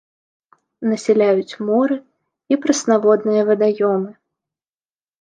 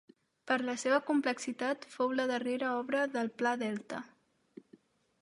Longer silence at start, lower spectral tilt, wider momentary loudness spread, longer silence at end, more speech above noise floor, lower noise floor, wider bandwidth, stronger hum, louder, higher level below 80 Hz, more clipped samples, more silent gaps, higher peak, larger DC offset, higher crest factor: first, 0.8 s vs 0.45 s; first, -5 dB/octave vs -3.5 dB/octave; about the same, 8 LU vs 7 LU; about the same, 1.1 s vs 1.15 s; first, over 74 dB vs 31 dB; first, under -90 dBFS vs -64 dBFS; second, 9.6 kHz vs 11.5 kHz; neither; first, -17 LUFS vs -33 LUFS; first, -70 dBFS vs -86 dBFS; neither; neither; first, -2 dBFS vs -16 dBFS; neither; about the same, 16 dB vs 20 dB